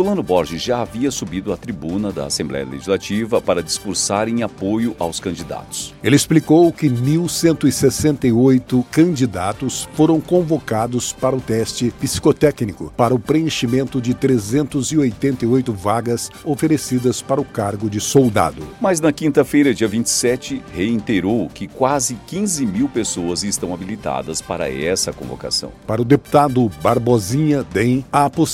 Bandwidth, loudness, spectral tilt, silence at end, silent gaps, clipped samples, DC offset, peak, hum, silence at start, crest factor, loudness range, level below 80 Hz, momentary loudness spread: 16.5 kHz; -18 LUFS; -5 dB/octave; 0 s; none; under 0.1%; under 0.1%; 0 dBFS; none; 0 s; 18 dB; 5 LU; -44 dBFS; 9 LU